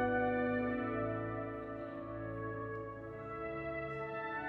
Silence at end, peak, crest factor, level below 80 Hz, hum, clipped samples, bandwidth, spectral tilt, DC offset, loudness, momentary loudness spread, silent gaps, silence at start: 0 s; -24 dBFS; 14 dB; -60 dBFS; none; under 0.1%; 4.9 kHz; -9.5 dB/octave; under 0.1%; -39 LUFS; 10 LU; none; 0 s